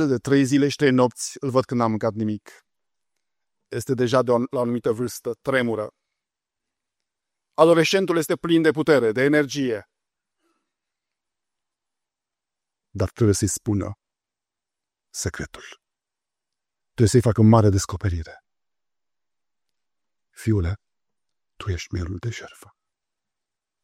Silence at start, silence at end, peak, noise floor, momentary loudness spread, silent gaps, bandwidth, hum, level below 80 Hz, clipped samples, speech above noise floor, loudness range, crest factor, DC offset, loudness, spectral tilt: 0 s; 1.35 s; -2 dBFS; -89 dBFS; 17 LU; none; 15.5 kHz; none; -48 dBFS; under 0.1%; 68 dB; 11 LU; 22 dB; under 0.1%; -21 LUFS; -6 dB/octave